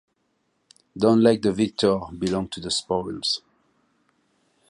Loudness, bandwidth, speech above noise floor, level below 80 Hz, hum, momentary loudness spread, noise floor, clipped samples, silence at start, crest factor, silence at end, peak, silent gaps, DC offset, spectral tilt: -23 LUFS; 11 kHz; 49 dB; -54 dBFS; none; 10 LU; -71 dBFS; under 0.1%; 0.95 s; 20 dB; 1.3 s; -4 dBFS; none; under 0.1%; -5 dB/octave